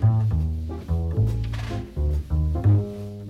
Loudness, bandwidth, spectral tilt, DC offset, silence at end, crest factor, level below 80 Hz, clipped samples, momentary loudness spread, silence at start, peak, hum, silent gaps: -25 LUFS; 6.4 kHz; -9 dB/octave; under 0.1%; 0 s; 12 dB; -28 dBFS; under 0.1%; 10 LU; 0 s; -10 dBFS; none; none